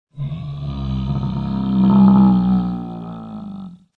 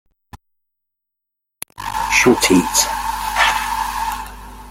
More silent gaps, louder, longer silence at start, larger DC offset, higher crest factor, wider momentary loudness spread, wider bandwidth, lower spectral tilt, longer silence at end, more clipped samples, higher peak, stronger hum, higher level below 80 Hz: neither; about the same, -17 LUFS vs -16 LUFS; second, 0.15 s vs 0.35 s; neither; about the same, 16 dB vs 20 dB; about the same, 20 LU vs 21 LU; second, 4.6 kHz vs 16.5 kHz; first, -11 dB/octave vs -2.5 dB/octave; first, 0.25 s vs 0 s; neither; about the same, -2 dBFS vs 0 dBFS; neither; about the same, -36 dBFS vs -38 dBFS